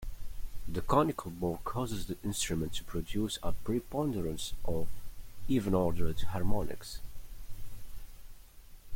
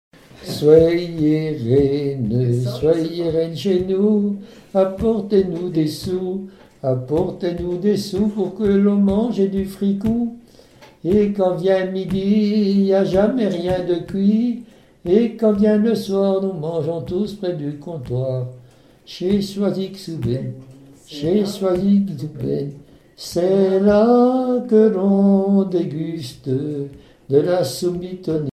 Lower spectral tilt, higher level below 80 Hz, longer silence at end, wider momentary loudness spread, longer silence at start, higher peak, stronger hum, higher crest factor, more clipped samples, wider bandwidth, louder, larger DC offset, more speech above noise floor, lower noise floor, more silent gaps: second, -5.5 dB/octave vs -7.5 dB/octave; about the same, -42 dBFS vs -46 dBFS; about the same, 0 s vs 0 s; first, 21 LU vs 12 LU; second, 0 s vs 0.4 s; second, -12 dBFS vs 0 dBFS; neither; about the same, 18 dB vs 18 dB; neither; first, 16.5 kHz vs 14 kHz; second, -35 LUFS vs -19 LUFS; neither; second, 21 dB vs 29 dB; first, -51 dBFS vs -47 dBFS; neither